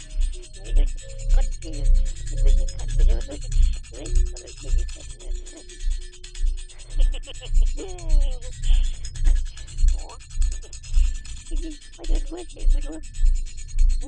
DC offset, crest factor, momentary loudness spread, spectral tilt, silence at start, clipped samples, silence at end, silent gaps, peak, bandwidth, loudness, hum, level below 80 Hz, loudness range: under 0.1%; 14 dB; 11 LU; -4.5 dB/octave; 0 s; under 0.1%; 0 s; none; -8 dBFS; 9.2 kHz; -29 LUFS; none; -20 dBFS; 5 LU